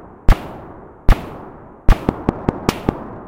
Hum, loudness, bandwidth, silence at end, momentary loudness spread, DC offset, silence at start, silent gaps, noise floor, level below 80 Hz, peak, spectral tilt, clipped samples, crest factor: none; -21 LUFS; 16 kHz; 0.1 s; 16 LU; under 0.1%; 0.3 s; none; -37 dBFS; -20 dBFS; 0 dBFS; -7 dB/octave; 0.7%; 18 dB